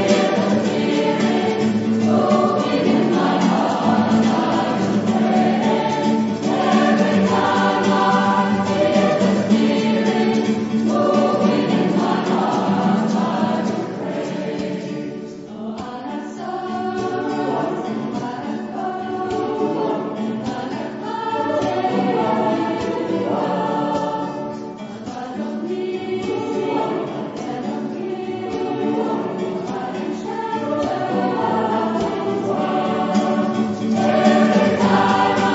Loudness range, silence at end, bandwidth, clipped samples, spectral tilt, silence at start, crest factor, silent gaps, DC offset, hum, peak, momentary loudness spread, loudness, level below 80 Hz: 8 LU; 0 s; 8 kHz; under 0.1%; -6 dB/octave; 0 s; 16 dB; none; under 0.1%; none; -2 dBFS; 10 LU; -19 LUFS; -58 dBFS